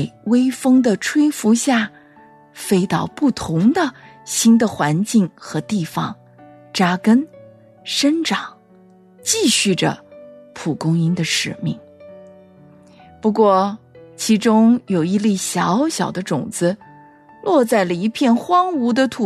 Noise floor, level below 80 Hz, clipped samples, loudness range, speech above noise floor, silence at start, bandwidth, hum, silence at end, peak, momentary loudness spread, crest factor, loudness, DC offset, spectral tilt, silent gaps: -48 dBFS; -60 dBFS; under 0.1%; 3 LU; 32 dB; 0 s; 14 kHz; none; 0 s; -4 dBFS; 12 LU; 14 dB; -18 LUFS; under 0.1%; -4.5 dB/octave; none